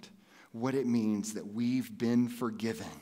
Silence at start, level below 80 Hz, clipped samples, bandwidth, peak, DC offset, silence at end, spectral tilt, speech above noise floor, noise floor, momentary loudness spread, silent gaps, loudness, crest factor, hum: 0 s; -78 dBFS; under 0.1%; 16 kHz; -18 dBFS; under 0.1%; 0 s; -6 dB/octave; 25 dB; -57 dBFS; 7 LU; none; -33 LUFS; 14 dB; none